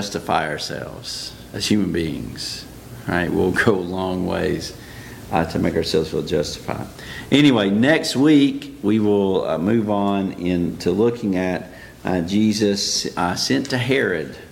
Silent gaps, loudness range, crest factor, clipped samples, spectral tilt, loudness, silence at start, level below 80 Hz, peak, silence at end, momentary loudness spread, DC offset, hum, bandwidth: none; 6 LU; 20 dB; under 0.1%; -5 dB/octave; -20 LUFS; 0 s; -46 dBFS; 0 dBFS; 0.05 s; 13 LU; under 0.1%; none; 17 kHz